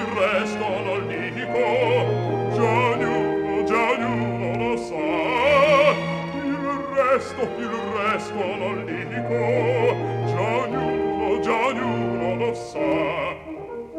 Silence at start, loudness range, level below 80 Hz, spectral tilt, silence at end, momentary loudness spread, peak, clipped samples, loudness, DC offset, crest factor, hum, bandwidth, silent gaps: 0 s; 3 LU; -52 dBFS; -6.5 dB/octave; 0 s; 7 LU; -4 dBFS; under 0.1%; -22 LUFS; under 0.1%; 18 dB; none; 12 kHz; none